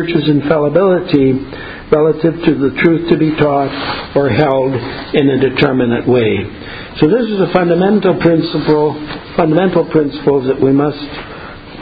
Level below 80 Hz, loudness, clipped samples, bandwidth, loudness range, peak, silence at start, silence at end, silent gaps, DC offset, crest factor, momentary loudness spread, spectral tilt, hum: -40 dBFS; -13 LUFS; 0.1%; 5 kHz; 1 LU; 0 dBFS; 0 s; 0 s; none; under 0.1%; 12 dB; 11 LU; -10 dB/octave; none